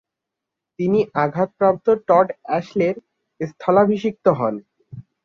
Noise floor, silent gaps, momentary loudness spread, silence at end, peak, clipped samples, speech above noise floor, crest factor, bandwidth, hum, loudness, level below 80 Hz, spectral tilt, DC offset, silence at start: -83 dBFS; none; 10 LU; 0.25 s; -2 dBFS; under 0.1%; 65 dB; 18 dB; 6.8 kHz; none; -19 LUFS; -62 dBFS; -8.5 dB/octave; under 0.1%; 0.8 s